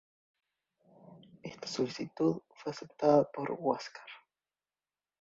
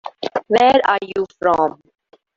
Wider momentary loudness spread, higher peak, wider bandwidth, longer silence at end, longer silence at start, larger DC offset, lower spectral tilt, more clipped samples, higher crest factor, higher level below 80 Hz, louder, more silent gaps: first, 22 LU vs 12 LU; second, -12 dBFS vs -2 dBFS; about the same, 7.8 kHz vs 7.8 kHz; first, 1.05 s vs 0.65 s; first, 1.05 s vs 0.05 s; neither; about the same, -6 dB/octave vs -5 dB/octave; neither; first, 24 dB vs 18 dB; second, -76 dBFS vs -56 dBFS; second, -33 LUFS vs -17 LUFS; neither